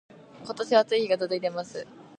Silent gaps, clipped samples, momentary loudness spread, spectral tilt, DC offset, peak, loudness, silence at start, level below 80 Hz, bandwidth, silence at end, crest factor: none; under 0.1%; 17 LU; -4.5 dB/octave; under 0.1%; -8 dBFS; -26 LUFS; 0.35 s; -78 dBFS; 9.8 kHz; 0.15 s; 20 dB